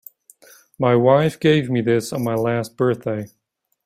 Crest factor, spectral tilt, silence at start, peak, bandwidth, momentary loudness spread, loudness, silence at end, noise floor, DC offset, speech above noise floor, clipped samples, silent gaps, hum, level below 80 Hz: 18 dB; -6.5 dB/octave; 0.8 s; -2 dBFS; 16 kHz; 10 LU; -19 LUFS; 0.6 s; -50 dBFS; under 0.1%; 32 dB; under 0.1%; none; none; -58 dBFS